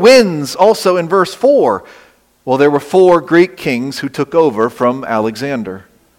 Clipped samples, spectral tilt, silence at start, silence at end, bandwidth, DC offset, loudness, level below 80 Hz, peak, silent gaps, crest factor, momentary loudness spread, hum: under 0.1%; -5 dB/octave; 0 s; 0.4 s; 16.5 kHz; under 0.1%; -12 LUFS; -54 dBFS; 0 dBFS; none; 12 dB; 11 LU; none